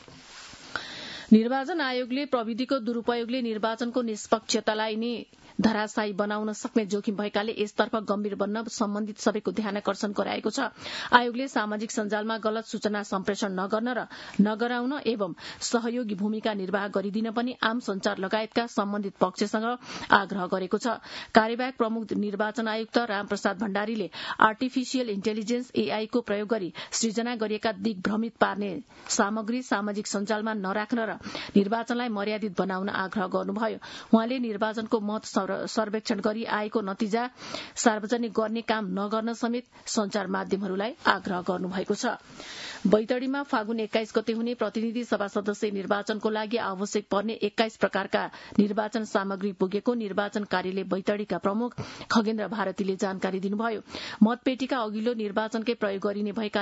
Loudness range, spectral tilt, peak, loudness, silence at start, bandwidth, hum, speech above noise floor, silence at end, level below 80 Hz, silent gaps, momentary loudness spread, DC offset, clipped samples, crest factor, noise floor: 2 LU; -4.5 dB/octave; -2 dBFS; -28 LUFS; 0 s; 8 kHz; none; 19 dB; 0 s; -68 dBFS; none; 6 LU; under 0.1%; under 0.1%; 26 dB; -47 dBFS